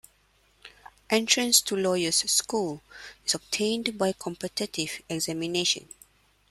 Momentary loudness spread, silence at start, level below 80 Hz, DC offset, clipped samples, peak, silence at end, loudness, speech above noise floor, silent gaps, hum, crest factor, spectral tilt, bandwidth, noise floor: 12 LU; 0.65 s; -64 dBFS; under 0.1%; under 0.1%; -4 dBFS; 0.7 s; -26 LUFS; 37 dB; none; none; 24 dB; -2 dB/octave; 15.5 kHz; -65 dBFS